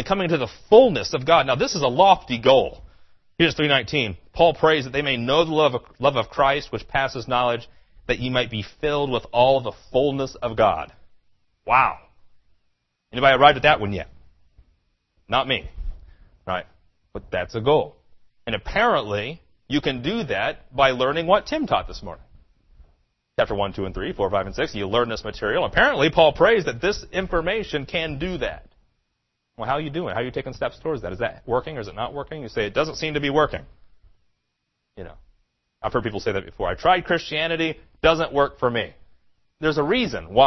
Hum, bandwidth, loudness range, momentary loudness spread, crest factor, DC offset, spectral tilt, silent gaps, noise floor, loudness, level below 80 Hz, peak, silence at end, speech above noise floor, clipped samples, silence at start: none; 6.2 kHz; 8 LU; 13 LU; 22 dB; under 0.1%; -5 dB/octave; none; -76 dBFS; -21 LUFS; -42 dBFS; -2 dBFS; 0 s; 55 dB; under 0.1%; 0 s